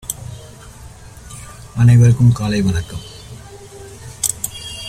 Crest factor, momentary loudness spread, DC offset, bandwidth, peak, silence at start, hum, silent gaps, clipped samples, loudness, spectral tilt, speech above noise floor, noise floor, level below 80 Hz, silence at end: 18 dB; 26 LU; under 0.1%; 15 kHz; 0 dBFS; 0.05 s; none; none; under 0.1%; -15 LUFS; -5.5 dB/octave; 25 dB; -37 dBFS; -38 dBFS; 0 s